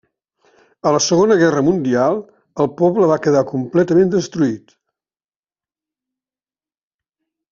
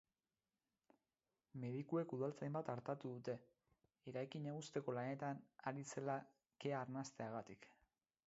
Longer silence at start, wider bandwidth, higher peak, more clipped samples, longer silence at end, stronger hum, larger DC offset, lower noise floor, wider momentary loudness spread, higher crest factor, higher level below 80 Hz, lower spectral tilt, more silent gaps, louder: second, 0.85 s vs 1.55 s; about the same, 7.4 kHz vs 7.6 kHz; first, -2 dBFS vs -28 dBFS; neither; first, 2.95 s vs 0.55 s; neither; neither; about the same, under -90 dBFS vs under -90 dBFS; about the same, 8 LU vs 8 LU; about the same, 16 dB vs 20 dB; first, -58 dBFS vs -88 dBFS; about the same, -6 dB/octave vs -6.5 dB/octave; neither; first, -16 LUFS vs -48 LUFS